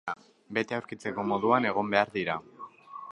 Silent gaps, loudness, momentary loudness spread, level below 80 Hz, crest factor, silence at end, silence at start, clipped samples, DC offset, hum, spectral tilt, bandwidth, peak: none; -29 LUFS; 20 LU; -70 dBFS; 24 dB; 0 s; 0.05 s; under 0.1%; under 0.1%; none; -6 dB/octave; 11 kHz; -8 dBFS